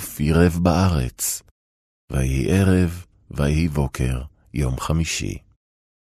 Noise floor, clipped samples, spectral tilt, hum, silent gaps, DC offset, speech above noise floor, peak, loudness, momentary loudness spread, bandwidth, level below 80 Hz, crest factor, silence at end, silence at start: under -90 dBFS; under 0.1%; -6 dB/octave; none; 1.51-2.08 s; under 0.1%; over 70 dB; -4 dBFS; -21 LUFS; 13 LU; 13.5 kHz; -32 dBFS; 18 dB; 0.7 s; 0 s